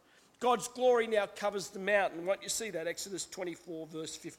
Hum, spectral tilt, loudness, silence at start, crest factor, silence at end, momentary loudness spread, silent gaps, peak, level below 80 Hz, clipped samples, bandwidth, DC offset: none; -2.5 dB/octave; -33 LUFS; 0.4 s; 18 dB; 0.05 s; 12 LU; none; -16 dBFS; -72 dBFS; under 0.1%; 16.5 kHz; under 0.1%